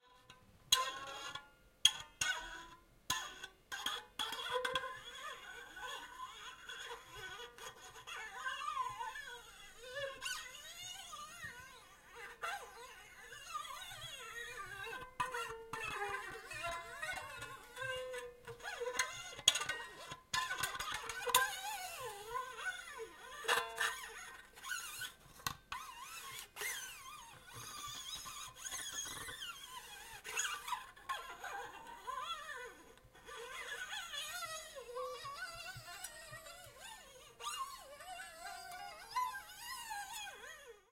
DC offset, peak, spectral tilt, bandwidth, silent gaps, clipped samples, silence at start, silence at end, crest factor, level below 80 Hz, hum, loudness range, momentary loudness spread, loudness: under 0.1%; -10 dBFS; 0.5 dB/octave; 16 kHz; none; under 0.1%; 0.05 s; 0.1 s; 36 dB; -70 dBFS; none; 10 LU; 15 LU; -42 LUFS